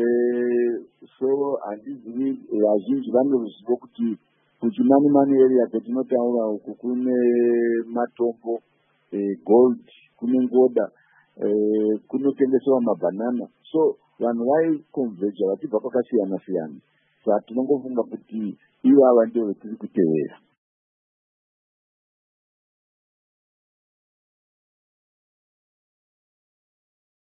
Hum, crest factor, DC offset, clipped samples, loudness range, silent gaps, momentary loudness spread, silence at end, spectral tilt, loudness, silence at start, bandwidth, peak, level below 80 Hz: none; 20 dB; under 0.1%; under 0.1%; 5 LU; none; 13 LU; 6.85 s; -12 dB/octave; -22 LUFS; 0 s; 3.7 kHz; -4 dBFS; -78 dBFS